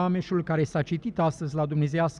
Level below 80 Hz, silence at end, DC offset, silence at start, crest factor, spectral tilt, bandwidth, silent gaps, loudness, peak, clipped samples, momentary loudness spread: -56 dBFS; 0 s; under 0.1%; 0 s; 12 dB; -7.5 dB/octave; 10 kHz; none; -27 LUFS; -14 dBFS; under 0.1%; 3 LU